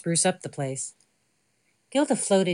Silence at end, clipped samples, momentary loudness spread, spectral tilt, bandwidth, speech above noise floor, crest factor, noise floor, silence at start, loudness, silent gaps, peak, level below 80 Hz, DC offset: 0 s; under 0.1%; 11 LU; -4 dB/octave; 11.5 kHz; 46 dB; 18 dB; -71 dBFS; 0.05 s; -26 LUFS; none; -10 dBFS; -78 dBFS; under 0.1%